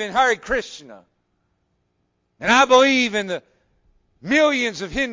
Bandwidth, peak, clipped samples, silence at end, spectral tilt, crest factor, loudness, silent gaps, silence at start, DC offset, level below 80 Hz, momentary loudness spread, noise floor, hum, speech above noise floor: 7.6 kHz; -4 dBFS; under 0.1%; 0 s; -3 dB/octave; 18 dB; -18 LUFS; none; 0 s; under 0.1%; -50 dBFS; 18 LU; -70 dBFS; none; 51 dB